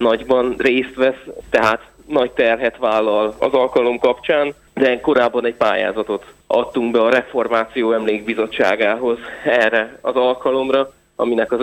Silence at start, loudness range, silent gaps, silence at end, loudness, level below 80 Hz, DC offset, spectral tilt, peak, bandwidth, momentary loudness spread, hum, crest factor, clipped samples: 0 s; 1 LU; none; 0 s; -17 LUFS; -52 dBFS; under 0.1%; -5 dB/octave; -2 dBFS; 11 kHz; 6 LU; none; 14 dB; under 0.1%